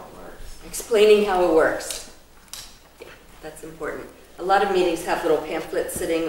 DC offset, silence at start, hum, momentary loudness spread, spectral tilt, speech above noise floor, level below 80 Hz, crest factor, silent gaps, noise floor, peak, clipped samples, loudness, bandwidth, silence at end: under 0.1%; 0 s; none; 25 LU; -3.5 dB/octave; 25 dB; -46 dBFS; 18 dB; none; -46 dBFS; -4 dBFS; under 0.1%; -21 LUFS; 16.5 kHz; 0 s